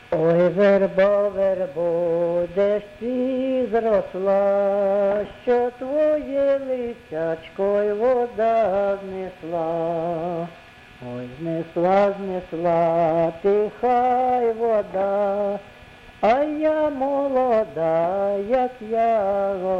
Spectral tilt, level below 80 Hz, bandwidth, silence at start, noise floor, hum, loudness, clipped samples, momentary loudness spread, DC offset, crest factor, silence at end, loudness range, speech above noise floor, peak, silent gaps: -8 dB/octave; -54 dBFS; 7.2 kHz; 0.1 s; -45 dBFS; none; -21 LUFS; under 0.1%; 9 LU; under 0.1%; 14 dB; 0 s; 4 LU; 24 dB; -8 dBFS; none